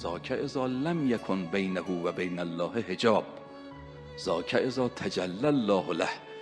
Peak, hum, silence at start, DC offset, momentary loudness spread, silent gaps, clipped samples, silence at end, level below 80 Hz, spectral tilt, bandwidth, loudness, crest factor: -10 dBFS; none; 0 s; under 0.1%; 17 LU; none; under 0.1%; 0 s; -60 dBFS; -6 dB/octave; 11 kHz; -30 LUFS; 20 dB